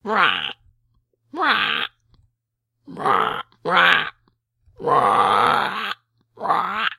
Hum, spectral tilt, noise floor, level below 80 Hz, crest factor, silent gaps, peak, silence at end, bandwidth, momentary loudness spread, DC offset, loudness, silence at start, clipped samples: none; -3.5 dB/octave; -78 dBFS; -62 dBFS; 22 dB; none; 0 dBFS; 0.05 s; 14.5 kHz; 15 LU; under 0.1%; -19 LUFS; 0.05 s; under 0.1%